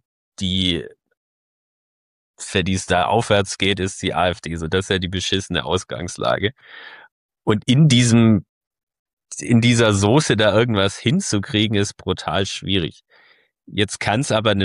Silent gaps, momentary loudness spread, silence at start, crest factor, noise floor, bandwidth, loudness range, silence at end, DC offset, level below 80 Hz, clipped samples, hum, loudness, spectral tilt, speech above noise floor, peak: 1.17-2.34 s, 7.12-7.29 s, 8.49-8.61 s, 8.67-8.71 s, 8.83-8.87 s, 8.99-9.06 s, 9.13-9.17 s; 12 LU; 0.4 s; 16 dB; under -90 dBFS; 11.5 kHz; 5 LU; 0 s; under 0.1%; -48 dBFS; under 0.1%; none; -19 LUFS; -5 dB/octave; over 71 dB; -4 dBFS